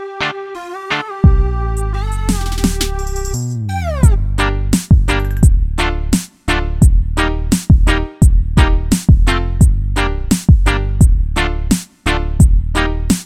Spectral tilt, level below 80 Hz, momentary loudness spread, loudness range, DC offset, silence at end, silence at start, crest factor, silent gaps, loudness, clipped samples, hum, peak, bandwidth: -5.5 dB/octave; -14 dBFS; 8 LU; 4 LU; under 0.1%; 0 s; 0 s; 12 dB; none; -15 LUFS; under 0.1%; none; 0 dBFS; 15.5 kHz